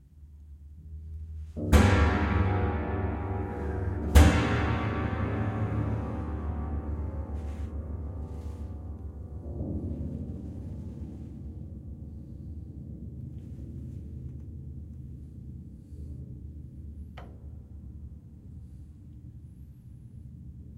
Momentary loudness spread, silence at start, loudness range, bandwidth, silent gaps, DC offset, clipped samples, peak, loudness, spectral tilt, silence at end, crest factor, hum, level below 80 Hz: 22 LU; 0 s; 18 LU; 16 kHz; none; under 0.1%; under 0.1%; -6 dBFS; -31 LUFS; -6.5 dB/octave; 0 s; 26 dB; none; -36 dBFS